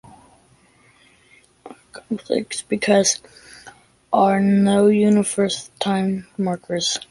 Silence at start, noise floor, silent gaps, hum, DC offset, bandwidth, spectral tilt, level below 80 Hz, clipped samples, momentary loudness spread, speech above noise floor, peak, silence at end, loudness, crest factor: 1.65 s; -55 dBFS; none; none; under 0.1%; 11.5 kHz; -4.5 dB/octave; -60 dBFS; under 0.1%; 10 LU; 37 dB; -4 dBFS; 0.1 s; -19 LUFS; 18 dB